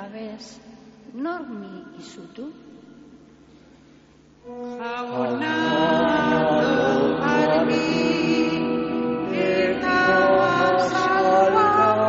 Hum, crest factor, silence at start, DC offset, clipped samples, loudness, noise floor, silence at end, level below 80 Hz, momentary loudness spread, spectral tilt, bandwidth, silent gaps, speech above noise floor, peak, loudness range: none; 14 dB; 0 s; under 0.1%; under 0.1%; -20 LUFS; -52 dBFS; 0 s; -54 dBFS; 21 LU; -3.5 dB/octave; 7.6 kHz; none; 24 dB; -6 dBFS; 17 LU